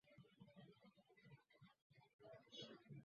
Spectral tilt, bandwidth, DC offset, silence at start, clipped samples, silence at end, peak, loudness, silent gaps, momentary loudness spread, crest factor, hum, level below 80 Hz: -4 dB/octave; 6.8 kHz; under 0.1%; 0.05 s; under 0.1%; 0 s; -44 dBFS; -63 LUFS; 1.82-1.90 s, 2.14-2.19 s; 11 LU; 20 dB; none; under -90 dBFS